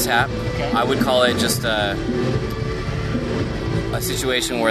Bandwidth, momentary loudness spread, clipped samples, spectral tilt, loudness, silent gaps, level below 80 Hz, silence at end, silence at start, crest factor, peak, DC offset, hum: 14 kHz; 7 LU; under 0.1%; -4.5 dB/octave; -20 LUFS; none; -34 dBFS; 0 s; 0 s; 16 dB; -4 dBFS; under 0.1%; none